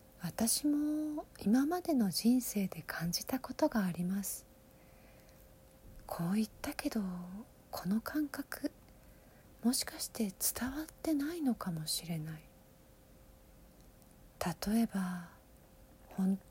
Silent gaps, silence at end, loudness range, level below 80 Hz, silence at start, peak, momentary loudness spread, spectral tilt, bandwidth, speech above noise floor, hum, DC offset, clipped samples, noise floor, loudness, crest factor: none; 0 s; 7 LU; -62 dBFS; 0.2 s; -18 dBFS; 12 LU; -4.5 dB/octave; 17 kHz; 26 dB; none; under 0.1%; under 0.1%; -61 dBFS; -36 LUFS; 20 dB